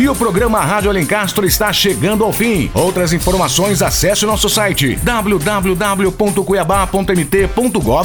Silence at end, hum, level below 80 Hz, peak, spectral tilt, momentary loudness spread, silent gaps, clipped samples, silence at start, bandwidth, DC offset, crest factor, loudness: 0 s; none; -28 dBFS; 0 dBFS; -4 dB/octave; 2 LU; none; under 0.1%; 0 s; over 20 kHz; under 0.1%; 12 dB; -13 LUFS